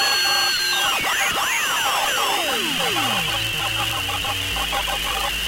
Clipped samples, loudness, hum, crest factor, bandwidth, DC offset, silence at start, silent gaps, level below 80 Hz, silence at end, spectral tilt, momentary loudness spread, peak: under 0.1%; -19 LUFS; none; 16 dB; 16 kHz; under 0.1%; 0 s; none; -42 dBFS; 0 s; -1 dB/octave; 5 LU; -6 dBFS